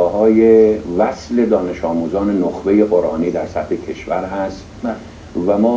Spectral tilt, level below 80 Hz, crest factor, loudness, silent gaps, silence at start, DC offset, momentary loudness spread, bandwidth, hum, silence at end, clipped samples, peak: -7.5 dB/octave; -42 dBFS; 16 dB; -16 LUFS; none; 0 s; under 0.1%; 14 LU; 7.6 kHz; none; 0 s; under 0.1%; 0 dBFS